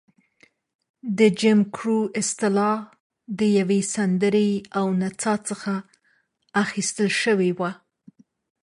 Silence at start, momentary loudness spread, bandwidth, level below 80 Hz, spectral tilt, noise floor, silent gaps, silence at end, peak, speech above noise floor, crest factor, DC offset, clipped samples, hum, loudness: 1.05 s; 10 LU; 11.5 kHz; -68 dBFS; -5 dB/octave; -67 dBFS; 3.00-3.10 s; 0.9 s; -6 dBFS; 45 dB; 18 dB; under 0.1%; under 0.1%; none; -22 LUFS